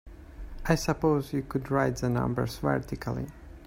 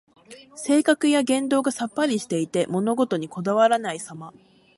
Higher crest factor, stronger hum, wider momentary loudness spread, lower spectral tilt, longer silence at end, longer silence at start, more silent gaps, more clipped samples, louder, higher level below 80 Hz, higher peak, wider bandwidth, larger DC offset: about the same, 22 dB vs 18 dB; neither; about the same, 12 LU vs 14 LU; first, -6.5 dB/octave vs -4.5 dB/octave; second, 0 s vs 0.45 s; second, 0.05 s vs 0.3 s; neither; neither; second, -29 LUFS vs -22 LUFS; first, -44 dBFS vs -70 dBFS; about the same, -8 dBFS vs -6 dBFS; first, 16 kHz vs 11.5 kHz; neither